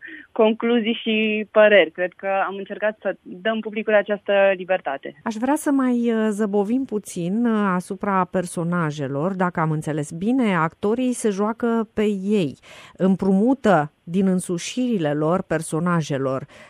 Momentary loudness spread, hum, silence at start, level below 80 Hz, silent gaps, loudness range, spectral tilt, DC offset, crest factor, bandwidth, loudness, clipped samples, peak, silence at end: 8 LU; none; 0 s; -60 dBFS; none; 3 LU; -6 dB/octave; under 0.1%; 20 dB; 15.5 kHz; -21 LUFS; under 0.1%; -2 dBFS; 0.05 s